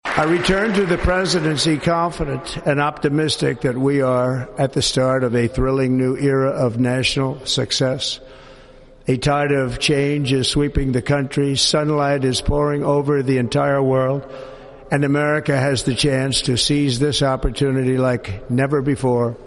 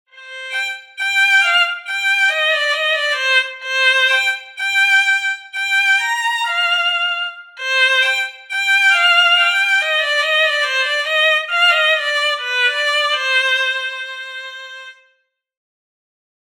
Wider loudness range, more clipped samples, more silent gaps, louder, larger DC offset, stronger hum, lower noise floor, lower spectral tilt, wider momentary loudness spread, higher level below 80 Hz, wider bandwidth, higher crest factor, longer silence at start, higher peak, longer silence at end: second, 2 LU vs 5 LU; neither; neither; second, -18 LUFS vs -14 LUFS; neither; neither; second, -44 dBFS vs -64 dBFS; first, -5 dB/octave vs 8 dB/octave; second, 5 LU vs 12 LU; first, -34 dBFS vs under -90 dBFS; second, 11.5 kHz vs over 20 kHz; about the same, 16 dB vs 16 dB; about the same, 0.05 s vs 0.15 s; about the same, -2 dBFS vs 0 dBFS; second, 0 s vs 1.65 s